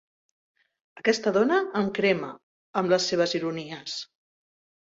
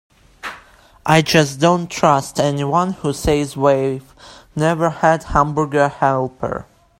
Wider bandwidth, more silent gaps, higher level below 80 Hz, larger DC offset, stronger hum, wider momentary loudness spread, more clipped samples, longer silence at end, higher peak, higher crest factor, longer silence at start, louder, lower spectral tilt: second, 7.8 kHz vs 16 kHz; first, 2.43-2.74 s vs none; second, -70 dBFS vs -40 dBFS; neither; neither; about the same, 12 LU vs 14 LU; neither; first, 0.8 s vs 0.4 s; second, -8 dBFS vs 0 dBFS; about the same, 20 dB vs 18 dB; first, 0.95 s vs 0.45 s; second, -26 LUFS vs -17 LUFS; about the same, -4.5 dB/octave vs -5.5 dB/octave